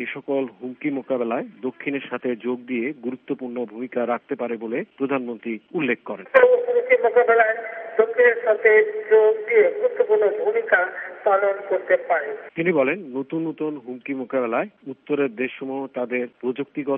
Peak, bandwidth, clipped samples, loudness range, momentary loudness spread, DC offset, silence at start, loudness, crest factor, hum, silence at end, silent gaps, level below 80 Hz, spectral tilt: 0 dBFS; 3.7 kHz; under 0.1%; 9 LU; 13 LU; under 0.1%; 0 s; -22 LUFS; 22 dB; none; 0 s; none; -78 dBFS; -4 dB/octave